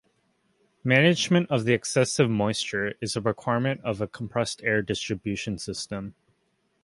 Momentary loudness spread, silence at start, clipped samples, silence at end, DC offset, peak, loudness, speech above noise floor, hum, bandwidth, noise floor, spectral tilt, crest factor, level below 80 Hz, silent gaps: 12 LU; 0.85 s; under 0.1%; 0.75 s; under 0.1%; -4 dBFS; -25 LUFS; 46 dB; none; 11.5 kHz; -71 dBFS; -5 dB/octave; 22 dB; -58 dBFS; none